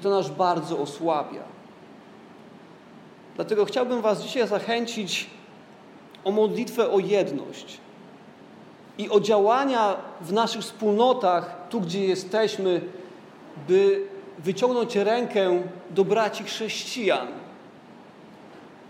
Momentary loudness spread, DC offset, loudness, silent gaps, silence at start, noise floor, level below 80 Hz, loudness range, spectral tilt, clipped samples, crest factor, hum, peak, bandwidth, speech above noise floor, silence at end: 18 LU; under 0.1%; -24 LUFS; none; 0 s; -48 dBFS; -80 dBFS; 5 LU; -5 dB/octave; under 0.1%; 20 dB; none; -6 dBFS; 16 kHz; 24 dB; 0 s